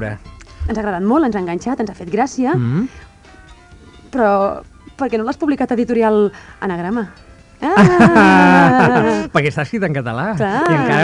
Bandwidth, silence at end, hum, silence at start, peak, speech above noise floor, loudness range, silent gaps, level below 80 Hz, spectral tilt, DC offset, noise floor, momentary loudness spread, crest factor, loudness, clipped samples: 11 kHz; 0 s; none; 0 s; -2 dBFS; 27 dB; 8 LU; none; -40 dBFS; -7 dB/octave; under 0.1%; -42 dBFS; 15 LU; 14 dB; -15 LUFS; under 0.1%